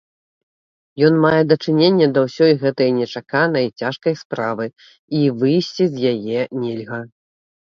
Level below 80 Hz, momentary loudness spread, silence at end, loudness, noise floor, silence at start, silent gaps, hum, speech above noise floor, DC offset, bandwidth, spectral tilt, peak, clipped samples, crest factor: -62 dBFS; 11 LU; 0.55 s; -18 LUFS; under -90 dBFS; 0.95 s; 4.25-4.30 s, 4.99-5.08 s; none; over 73 dB; under 0.1%; 7.2 kHz; -7 dB/octave; 0 dBFS; under 0.1%; 18 dB